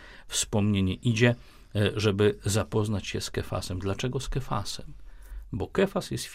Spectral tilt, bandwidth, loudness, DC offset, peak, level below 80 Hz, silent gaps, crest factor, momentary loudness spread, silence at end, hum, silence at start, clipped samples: -5 dB/octave; 16 kHz; -28 LUFS; under 0.1%; -8 dBFS; -44 dBFS; none; 20 dB; 12 LU; 0 s; none; 0 s; under 0.1%